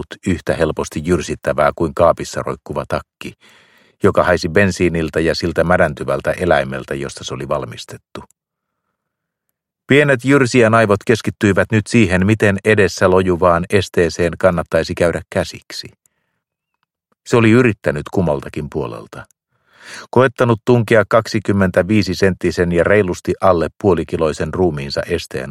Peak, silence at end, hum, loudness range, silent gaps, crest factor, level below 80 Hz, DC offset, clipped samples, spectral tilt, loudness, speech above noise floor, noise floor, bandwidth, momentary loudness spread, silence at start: 0 dBFS; 0 s; none; 6 LU; none; 16 dB; -40 dBFS; under 0.1%; under 0.1%; -6 dB/octave; -16 LUFS; 62 dB; -78 dBFS; 15 kHz; 12 LU; 0 s